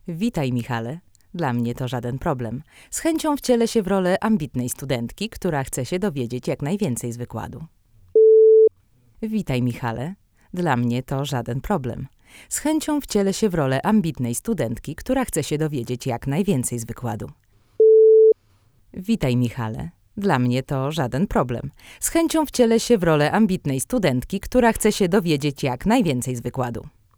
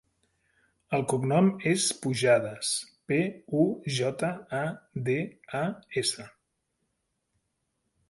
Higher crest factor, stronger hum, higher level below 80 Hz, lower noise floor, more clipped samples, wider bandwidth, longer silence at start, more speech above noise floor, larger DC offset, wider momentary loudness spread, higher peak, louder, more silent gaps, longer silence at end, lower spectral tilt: about the same, 18 dB vs 18 dB; neither; first, -44 dBFS vs -68 dBFS; second, -58 dBFS vs -79 dBFS; neither; first, 19.5 kHz vs 11.5 kHz; second, 0.05 s vs 0.9 s; second, 36 dB vs 51 dB; neither; first, 14 LU vs 9 LU; first, -4 dBFS vs -10 dBFS; first, -21 LUFS vs -28 LUFS; neither; second, 0.3 s vs 1.8 s; about the same, -5.5 dB/octave vs -4.5 dB/octave